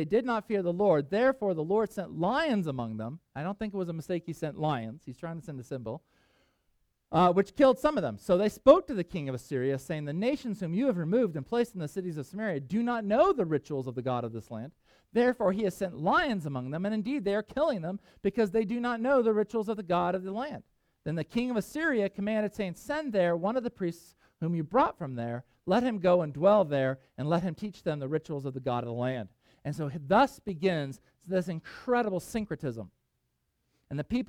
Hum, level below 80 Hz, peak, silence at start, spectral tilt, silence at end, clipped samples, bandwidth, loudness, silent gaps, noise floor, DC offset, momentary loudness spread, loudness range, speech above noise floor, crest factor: none; -60 dBFS; -6 dBFS; 0 s; -7 dB/octave; 0.05 s; under 0.1%; 15.5 kHz; -30 LUFS; none; -78 dBFS; under 0.1%; 13 LU; 6 LU; 49 dB; 22 dB